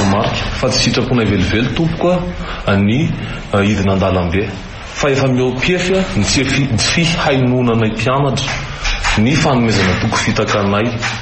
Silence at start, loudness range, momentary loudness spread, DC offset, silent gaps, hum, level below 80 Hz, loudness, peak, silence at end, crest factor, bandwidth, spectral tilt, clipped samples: 0 s; 2 LU; 6 LU; under 0.1%; none; none; -28 dBFS; -14 LUFS; -2 dBFS; 0 s; 12 dB; 8.8 kHz; -5 dB/octave; under 0.1%